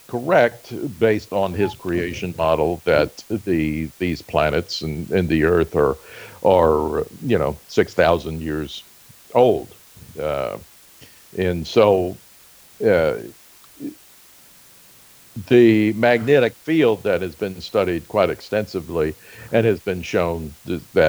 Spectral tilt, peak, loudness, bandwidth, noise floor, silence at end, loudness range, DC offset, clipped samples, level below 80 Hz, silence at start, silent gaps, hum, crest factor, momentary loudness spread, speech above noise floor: -6.5 dB/octave; -2 dBFS; -20 LUFS; over 20 kHz; -48 dBFS; 0 s; 5 LU; under 0.1%; under 0.1%; -44 dBFS; 0.1 s; none; none; 18 dB; 14 LU; 29 dB